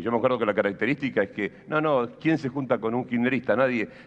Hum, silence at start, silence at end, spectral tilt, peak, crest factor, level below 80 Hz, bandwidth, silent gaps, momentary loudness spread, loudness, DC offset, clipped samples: none; 0 s; 0.05 s; -8 dB/octave; -8 dBFS; 18 dB; -64 dBFS; 8 kHz; none; 4 LU; -25 LUFS; under 0.1%; under 0.1%